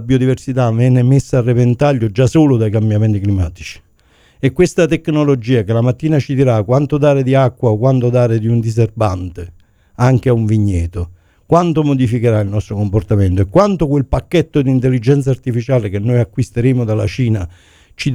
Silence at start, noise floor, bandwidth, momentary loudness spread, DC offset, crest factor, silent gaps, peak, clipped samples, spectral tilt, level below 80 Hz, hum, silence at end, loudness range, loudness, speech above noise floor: 0 s; -51 dBFS; 11.5 kHz; 7 LU; under 0.1%; 14 dB; none; 0 dBFS; under 0.1%; -8 dB/octave; -36 dBFS; none; 0 s; 2 LU; -14 LUFS; 38 dB